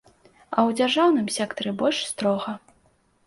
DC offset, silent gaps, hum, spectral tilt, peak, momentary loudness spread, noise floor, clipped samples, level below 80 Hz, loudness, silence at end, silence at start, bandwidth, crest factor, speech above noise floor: under 0.1%; none; none; -4 dB/octave; -6 dBFS; 9 LU; -63 dBFS; under 0.1%; -66 dBFS; -23 LUFS; 0.7 s; 0.5 s; 11.5 kHz; 18 dB; 40 dB